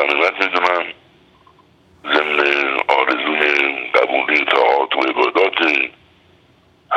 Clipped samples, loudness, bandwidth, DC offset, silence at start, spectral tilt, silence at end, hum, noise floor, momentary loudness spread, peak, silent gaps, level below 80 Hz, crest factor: under 0.1%; -15 LUFS; 10.5 kHz; under 0.1%; 0 s; -3 dB/octave; 0 s; none; -53 dBFS; 4 LU; 0 dBFS; none; -64 dBFS; 18 dB